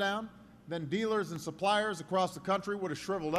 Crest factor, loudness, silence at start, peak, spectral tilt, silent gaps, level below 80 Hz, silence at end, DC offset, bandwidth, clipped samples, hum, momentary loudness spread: 16 dB; -34 LUFS; 0 s; -18 dBFS; -5 dB/octave; none; -68 dBFS; 0 s; under 0.1%; 13.5 kHz; under 0.1%; none; 9 LU